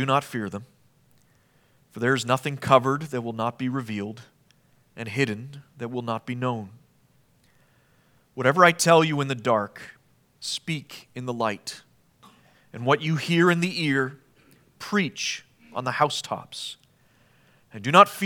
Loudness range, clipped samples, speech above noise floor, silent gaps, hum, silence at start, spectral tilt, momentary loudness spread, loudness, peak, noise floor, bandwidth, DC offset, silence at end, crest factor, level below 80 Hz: 9 LU; under 0.1%; 38 dB; none; none; 0 s; -4.5 dB/octave; 21 LU; -24 LUFS; 0 dBFS; -62 dBFS; 19 kHz; under 0.1%; 0 s; 26 dB; -72 dBFS